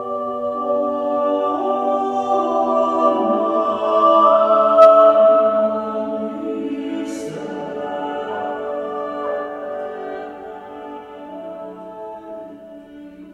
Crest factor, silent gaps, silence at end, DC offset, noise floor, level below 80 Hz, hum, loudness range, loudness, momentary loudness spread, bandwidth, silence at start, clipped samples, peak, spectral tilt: 18 dB; none; 0 s; under 0.1%; -38 dBFS; -62 dBFS; none; 17 LU; -17 LUFS; 22 LU; 8.6 kHz; 0 s; under 0.1%; 0 dBFS; -6 dB/octave